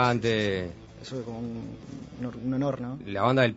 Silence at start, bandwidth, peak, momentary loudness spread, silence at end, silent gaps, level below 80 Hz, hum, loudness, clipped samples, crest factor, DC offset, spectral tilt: 0 s; 8 kHz; -8 dBFS; 16 LU; 0 s; none; -56 dBFS; none; -30 LUFS; under 0.1%; 22 dB; under 0.1%; -6.5 dB/octave